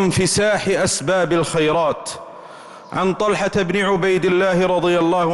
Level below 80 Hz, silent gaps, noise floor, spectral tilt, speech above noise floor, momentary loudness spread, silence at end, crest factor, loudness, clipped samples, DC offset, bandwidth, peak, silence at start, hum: -46 dBFS; none; -38 dBFS; -4.5 dB/octave; 21 dB; 14 LU; 0 s; 10 dB; -18 LUFS; under 0.1%; under 0.1%; 12 kHz; -8 dBFS; 0 s; none